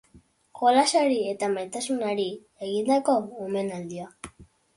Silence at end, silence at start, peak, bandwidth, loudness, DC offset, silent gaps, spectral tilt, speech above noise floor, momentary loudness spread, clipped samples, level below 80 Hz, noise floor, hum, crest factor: 0.3 s; 0.15 s; -8 dBFS; 11.5 kHz; -25 LUFS; under 0.1%; none; -4 dB/octave; 33 dB; 17 LU; under 0.1%; -64 dBFS; -58 dBFS; none; 18 dB